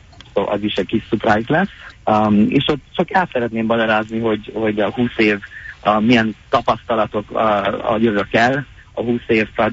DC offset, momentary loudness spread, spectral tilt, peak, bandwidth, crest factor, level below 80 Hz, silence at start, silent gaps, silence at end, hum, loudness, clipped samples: under 0.1%; 7 LU; -6.5 dB/octave; 0 dBFS; 7.8 kHz; 16 dB; -46 dBFS; 0.2 s; none; 0 s; none; -18 LUFS; under 0.1%